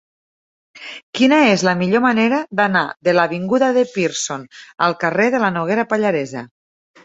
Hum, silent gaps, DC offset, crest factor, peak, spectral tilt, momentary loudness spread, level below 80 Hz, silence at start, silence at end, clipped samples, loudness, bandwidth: none; 1.03-1.13 s; under 0.1%; 16 dB; 0 dBFS; -4.5 dB/octave; 14 LU; -62 dBFS; 0.75 s; 0.6 s; under 0.1%; -17 LUFS; 8.2 kHz